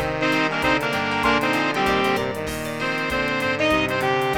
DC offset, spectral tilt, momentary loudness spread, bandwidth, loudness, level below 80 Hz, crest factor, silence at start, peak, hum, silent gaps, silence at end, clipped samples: 0.2%; -4.5 dB/octave; 5 LU; over 20 kHz; -21 LUFS; -44 dBFS; 18 dB; 0 s; -4 dBFS; none; none; 0 s; under 0.1%